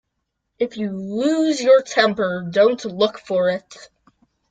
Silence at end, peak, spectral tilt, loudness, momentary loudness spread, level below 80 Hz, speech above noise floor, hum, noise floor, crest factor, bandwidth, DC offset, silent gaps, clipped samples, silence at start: 0.65 s; -2 dBFS; -4.5 dB/octave; -19 LUFS; 11 LU; -64 dBFS; 57 dB; none; -76 dBFS; 18 dB; 9.2 kHz; under 0.1%; none; under 0.1%; 0.6 s